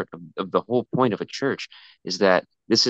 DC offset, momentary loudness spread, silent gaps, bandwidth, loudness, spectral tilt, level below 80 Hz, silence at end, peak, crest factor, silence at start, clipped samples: under 0.1%; 13 LU; none; 8.4 kHz; -24 LUFS; -4 dB/octave; -72 dBFS; 0 s; -4 dBFS; 20 dB; 0 s; under 0.1%